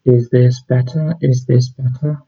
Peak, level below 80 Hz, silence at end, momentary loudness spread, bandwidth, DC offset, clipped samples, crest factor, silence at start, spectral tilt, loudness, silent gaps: 0 dBFS; -52 dBFS; 0.1 s; 7 LU; 6.8 kHz; under 0.1%; under 0.1%; 14 dB; 0.05 s; -8.5 dB/octave; -15 LUFS; none